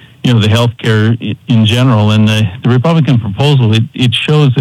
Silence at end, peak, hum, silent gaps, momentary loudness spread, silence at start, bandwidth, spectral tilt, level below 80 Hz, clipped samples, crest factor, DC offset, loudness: 0 s; 0 dBFS; none; none; 4 LU; 0.25 s; 12.5 kHz; -6.5 dB/octave; -48 dBFS; under 0.1%; 8 dB; under 0.1%; -10 LUFS